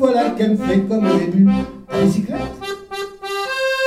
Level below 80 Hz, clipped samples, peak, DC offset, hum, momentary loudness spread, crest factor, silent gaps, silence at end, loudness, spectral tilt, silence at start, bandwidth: -44 dBFS; under 0.1%; -2 dBFS; under 0.1%; none; 13 LU; 14 dB; none; 0 s; -18 LUFS; -6.5 dB/octave; 0 s; 14 kHz